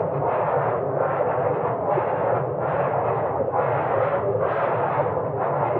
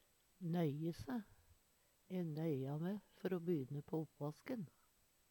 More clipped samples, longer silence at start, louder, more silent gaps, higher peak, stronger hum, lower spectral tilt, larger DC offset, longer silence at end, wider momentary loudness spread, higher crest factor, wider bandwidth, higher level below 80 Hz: neither; second, 0 s vs 0.4 s; first, -23 LUFS vs -45 LUFS; neither; first, -8 dBFS vs -28 dBFS; neither; first, -11.5 dB/octave vs -8.5 dB/octave; neither; second, 0 s vs 0.6 s; second, 2 LU vs 8 LU; about the same, 14 dB vs 18 dB; second, 4.2 kHz vs 19 kHz; first, -58 dBFS vs -76 dBFS